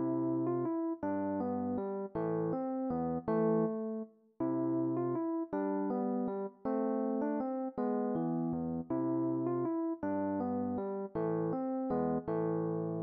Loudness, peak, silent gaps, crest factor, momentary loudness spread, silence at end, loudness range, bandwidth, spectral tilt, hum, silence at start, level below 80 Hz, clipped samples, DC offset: -35 LUFS; -22 dBFS; none; 12 dB; 4 LU; 0 s; 1 LU; 2.6 kHz; -11 dB/octave; none; 0 s; -68 dBFS; under 0.1%; under 0.1%